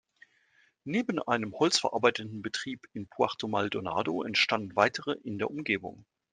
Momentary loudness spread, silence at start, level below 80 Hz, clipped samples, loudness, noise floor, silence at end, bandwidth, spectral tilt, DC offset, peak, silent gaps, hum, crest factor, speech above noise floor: 10 LU; 0.85 s; -72 dBFS; under 0.1%; -30 LUFS; -68 dBFS; 0.3 s; 10 kHz; -3.5 dB/octave; under 0.1%; -6 dBFS; none; none; 24 dB; 37 dB